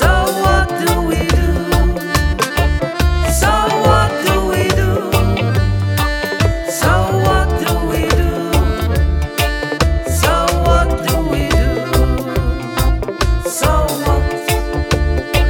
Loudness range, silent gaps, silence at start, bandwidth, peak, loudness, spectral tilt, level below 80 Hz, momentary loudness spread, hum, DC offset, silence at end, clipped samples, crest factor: 2 LU; none; 0 s; 19 kHz; 0 dBFS; -15 LUFS; -5 dB/octave; -18 dBFS; 4 LU; none; under 0.1%; 0 s; under 0.1%; 14 dB